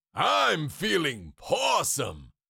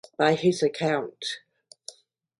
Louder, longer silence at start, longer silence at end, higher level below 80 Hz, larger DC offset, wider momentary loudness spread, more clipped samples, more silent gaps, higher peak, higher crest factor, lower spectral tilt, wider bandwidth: about the same, -26 LUFS vs -25 LUFS; about the same, 0.15 s vs 0.2 s; second, 0.25 s vs 0.5 s; first, -56 dBFS vs -70 dBFS; neither; second, 8 LU vs 22 LU; neither; neither; second, -12 dBFS vs -8 dBFS; about the same, 16 dB vs 20 dB; second, -2.5 dB/octave vs -5 dB/octave; first, 17 kHz vs 11.5 kHz